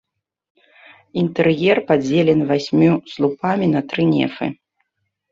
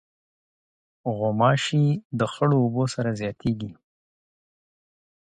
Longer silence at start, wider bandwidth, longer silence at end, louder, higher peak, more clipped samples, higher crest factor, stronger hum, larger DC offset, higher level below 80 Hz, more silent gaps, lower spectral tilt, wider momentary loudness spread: about the same, 1.15 s vs 1.05 s; second, 7.6 kHz vs 9.6 kHz; second, 0.8 s vs 1.5 s; first, -18 LUFS vs -24 LUFS; first, -2 dBFS vs -6 dBFS; neither; about the same, 16 dB vs 20 dB; neither; neither; about the same, -58 dBFS vs -58 dBFS; second, none vs 2.05-2.10 s; about the same, -7.5 dB/octave vs -6.5 dB/octave; second, 7 LU vs 11 LU